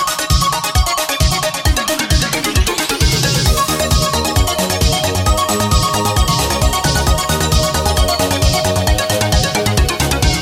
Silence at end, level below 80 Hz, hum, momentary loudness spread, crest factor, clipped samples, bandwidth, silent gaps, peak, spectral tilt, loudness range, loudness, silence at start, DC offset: 0 s; -20 dBFS; none; 1 LU; 14 dB; under 0.1%; 17 kHz; none; 0 dBFS; -3.5 dB/octave; 0 LU; -14 LUFS; 0 s; under 0.1%